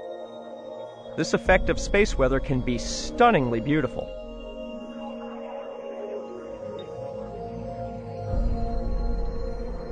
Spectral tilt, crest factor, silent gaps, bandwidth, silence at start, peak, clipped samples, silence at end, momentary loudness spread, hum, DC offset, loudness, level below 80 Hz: -5.5 dB/octave; 20 dB; none; 10 kHz; 0 s; -6 dBFS; under 0.1%; 0 s; 16 LU; none; under 0.1%; -27 LUFS; -34 dBFS